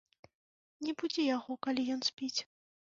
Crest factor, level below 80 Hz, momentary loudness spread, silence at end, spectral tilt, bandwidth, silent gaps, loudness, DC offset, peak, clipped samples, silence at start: 18 dB; -80 dBFS; 8 LU; 0.45 s; -2.5 dB/octave; 7.6 kHz; 2.13-2.17 s; -35 LUFS; under 0.1%; -20 dBFS; under 0.1%; 0.8 s